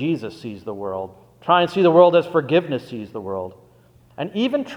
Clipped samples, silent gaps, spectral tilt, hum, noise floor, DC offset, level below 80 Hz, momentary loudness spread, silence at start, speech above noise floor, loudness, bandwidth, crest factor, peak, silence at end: under 0.1%; none; -7 dB/octave; none; -52 dBFS; under 0.1%; -64 dBFS; 19 LU; 0 s; 33 dB; -19 LUFS; 9.4 kHz; 20 dB; 0 dBFS; 0 s